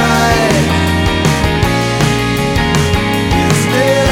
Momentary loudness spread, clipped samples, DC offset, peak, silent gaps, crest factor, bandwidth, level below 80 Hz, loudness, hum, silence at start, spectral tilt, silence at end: 3 LU; under 0.1%; under 0.1%; 0 dBFS; none; 12 dB; 17.5 kHz; -24 dBFS; -12 LUFS; none; 0 s; -5 dB/octave; 0 s